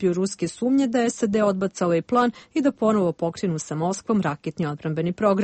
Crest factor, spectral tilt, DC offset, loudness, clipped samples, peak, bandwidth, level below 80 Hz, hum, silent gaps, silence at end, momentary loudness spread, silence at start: 14 dB; -6 dB/octave; under 0.1%; -23 LUFS; under 0.1%; -8 dBFS; 8.8 kHz; -60 dBFS; none; none; 0 s; 6 LU; 0 s